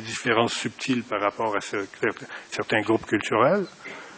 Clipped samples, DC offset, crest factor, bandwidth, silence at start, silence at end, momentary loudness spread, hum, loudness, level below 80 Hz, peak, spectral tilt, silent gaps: under 0.1%; under 0.1%; 20 dB; 8 kHz; 0 s; 0 s; 11 LU; none; -25 LUFS; -62 dBFS; -6 dBFS; -4.5 dB/octave; none